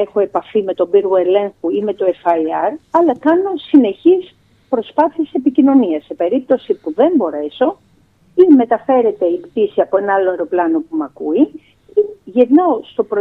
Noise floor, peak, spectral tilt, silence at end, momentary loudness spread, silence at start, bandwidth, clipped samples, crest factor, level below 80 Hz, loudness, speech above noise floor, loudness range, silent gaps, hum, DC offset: -52 dBFS; 0 dBFS; -8 dB/octave; 0 s; 8 LU; 0 s; 4.1 kHz; under 0.1%; 14 dB; -62 dBFS; -15 LUFS; 38 dB; 2 LU; none; none; under 0.1%